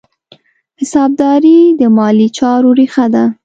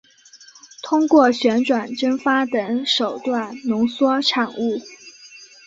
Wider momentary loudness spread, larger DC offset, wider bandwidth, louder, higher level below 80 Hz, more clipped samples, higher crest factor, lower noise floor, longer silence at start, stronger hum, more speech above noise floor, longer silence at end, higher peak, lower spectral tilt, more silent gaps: second, 6 LU vs 12 LU; neither; first, 9 kHz vs 7.8 kHz; first, -9 LUFS vs -19 LUFS; first, -54 dBFS vs -66 dBFS; neither; second, 10 dB vs 18 dB; about the same, -46 dBFS vs -48 dBFS; first, 0.8 s vs 0.35 s; neither; first, 38 dB vs 29 dB; about the same, 0.1 s vs 0.2 s; about the same, 0 dBFS vs -2 dBFS; first, -6.5 dB/octave vs -4 dB/octave; neither